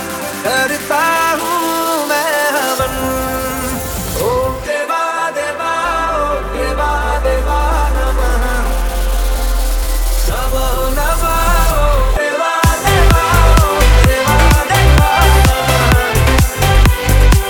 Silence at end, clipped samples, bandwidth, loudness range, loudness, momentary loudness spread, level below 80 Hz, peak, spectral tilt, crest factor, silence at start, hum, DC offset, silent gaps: 0 s; under 0.1%; over 20 kHz; 6 LU; -14 LUFS; 8 LU; -16 dBFS; 0 dBFS; -4.5 dB/octave; 12 dB; 0 s; none; under 0.1%; none